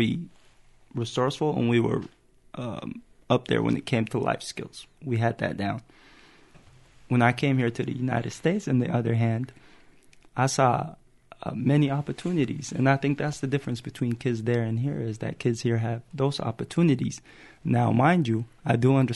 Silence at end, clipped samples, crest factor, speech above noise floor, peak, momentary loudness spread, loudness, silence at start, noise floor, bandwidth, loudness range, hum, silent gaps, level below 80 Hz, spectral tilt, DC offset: 0 s; under 0.1%; 20 dB; 30 dB; -6 dBFS; 14 LU; -26 LUFS; 0 s; -55 dBFS; 11.5 kHz; 3 LU; none; none; -58 dBFS; -6.5 dB/octave; under 0.1%